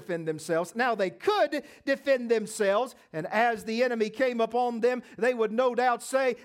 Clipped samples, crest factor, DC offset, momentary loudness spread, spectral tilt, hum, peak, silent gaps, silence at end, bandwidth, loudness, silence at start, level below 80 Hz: under 0.1%; 16 dB; under 0.1%; 5 LU; -4.5 dB/octave; none; -12 dBFS; none; 0 s; 16 kHz; -27 LUFS; 0 s; -76 dBFS